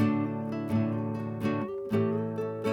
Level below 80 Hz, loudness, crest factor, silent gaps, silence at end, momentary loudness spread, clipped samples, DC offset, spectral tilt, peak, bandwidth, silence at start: -64 dBFS; -31 LUFS; 14 dB; none; 0 s; 5 LU; under 0.1%; under 0.1%; -9 dB/octave; -14 dBFS; 12.5 kHz; 0 s